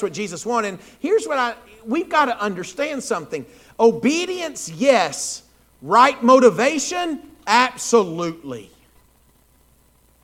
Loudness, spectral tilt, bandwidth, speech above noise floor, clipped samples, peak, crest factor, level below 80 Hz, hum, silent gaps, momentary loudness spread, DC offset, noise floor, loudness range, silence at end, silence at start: -19 LUFS; -3.5 dB/octave; 16 kHz; 37 dB; under 0.1%; 0 dBFS; 20 dB; -60 dBFS; none; none; 17 LU; under 0.1%; -57 dBFS; 5 LU; 1.6 s; 0 s